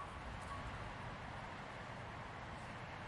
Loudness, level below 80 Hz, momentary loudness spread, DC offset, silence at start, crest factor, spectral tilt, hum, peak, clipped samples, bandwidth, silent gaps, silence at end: -49 LUFS; -58 dBFS; 2 LU; under 0.1%; 0 s; 12 dB; -5.5 dB/octave; none; -36 dBFS; under 0.1%; 11.5 kHz; none; 0 s